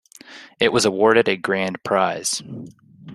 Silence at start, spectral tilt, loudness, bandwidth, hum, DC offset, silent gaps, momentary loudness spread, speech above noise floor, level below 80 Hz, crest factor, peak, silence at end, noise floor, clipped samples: 0.3 s; -3.5 dB/octave; -19 LUFS; 13.5 kHz; none; under 0.1%; none; 18 LU; 24 dB; -60 dBFS; 20 dB; -2 dBFS; 0 s; -43 dBFS; under 0.1%